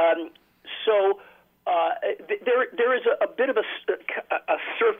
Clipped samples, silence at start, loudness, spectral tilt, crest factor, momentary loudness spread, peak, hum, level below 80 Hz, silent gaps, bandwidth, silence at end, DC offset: under 0.1%; 0 s; -25 LUFS; -5 dB/octave; 14 dB; 7 LU; -10 dBFS; none; -74 dBFS; none; 3.8 kHz; 0 s; under 0.1%